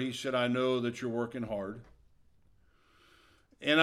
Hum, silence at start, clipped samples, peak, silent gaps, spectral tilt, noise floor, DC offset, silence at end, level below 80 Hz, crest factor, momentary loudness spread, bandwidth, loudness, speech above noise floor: none; 0 s; under 0.1%; -10 dBFS; none; -5 dB/octave; -65 dBFS; under 0.1%; 0 s; -66 dBFS; 24 dB; 10 LU; 14 kHz; -33 LUFS; 32 dB